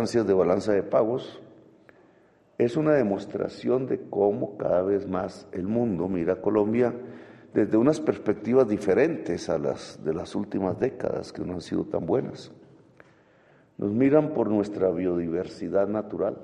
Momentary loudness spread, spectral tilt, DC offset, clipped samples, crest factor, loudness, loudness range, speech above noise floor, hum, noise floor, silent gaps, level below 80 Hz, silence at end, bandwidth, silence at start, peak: 10 LU; -7.5 dB/octave; under 0.1%; under 0.1%; 20 dB; -26 LUFS; 5 LU; 34 dB; none; -59 dBFS; none; -62 dBFS; 0 s; 10.5 kHz; 0 s; -6 dBFS